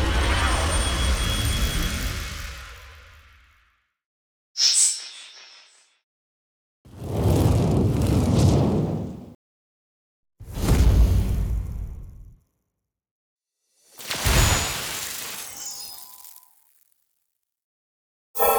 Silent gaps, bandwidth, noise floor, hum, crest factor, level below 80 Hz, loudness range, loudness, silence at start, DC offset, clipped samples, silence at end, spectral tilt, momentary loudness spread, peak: 4.06-4.55 s, 6.03-6.85 s, 9.35-10.23 s, 13.11-13.36 s, 17.64-18.34 s; over 20 kHz; -81 dBFS; none; 18 dB; -30 dBFS; 7 LU; -22 LUFS; 0 s; under 0.1%; under 0.1%; 0 s; -4 dB/octave; 20 LU; -6 dBFS